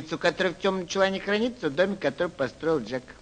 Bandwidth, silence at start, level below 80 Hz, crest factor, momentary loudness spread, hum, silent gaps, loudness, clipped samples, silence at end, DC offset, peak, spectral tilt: 9.6 kHz; 0 s; -56 dBFS; 20 dB; 4 LU; none; none; -27 LUFS; under 0.1%; 0.1 s; under 0.1%; -6 dBFS; -5 dB/octave